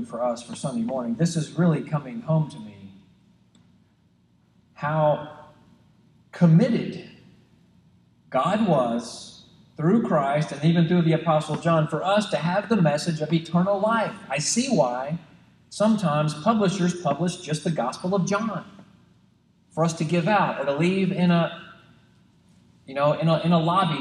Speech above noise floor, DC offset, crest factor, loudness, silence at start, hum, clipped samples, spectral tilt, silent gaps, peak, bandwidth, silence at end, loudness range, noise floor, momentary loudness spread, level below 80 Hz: 39 dB; under 0.1%; 18 dB; -23 LUFS; 0 s; none; under 0.1%; -6 dB/octave; none; -6 dBFS; 11 kHz; 0 s; 6 LU; -61 dBFS; 11 LU; -64 dBFS